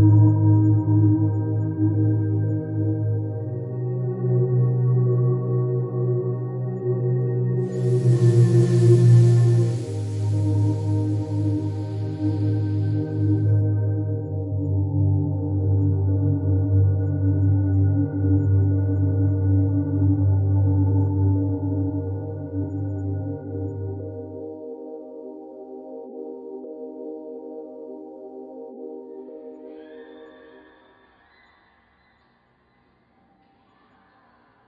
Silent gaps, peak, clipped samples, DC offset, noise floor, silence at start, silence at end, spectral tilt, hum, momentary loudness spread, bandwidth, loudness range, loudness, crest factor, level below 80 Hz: none; -6 dBFS; under 0.1%; under 0.1%; -62 dBFS; 0 s; 4.35 s; -10 dB/octave; none; 20 LU; 10.5 kHz; 19 LU; -21 LUFS; 16 dB; -56 dBFS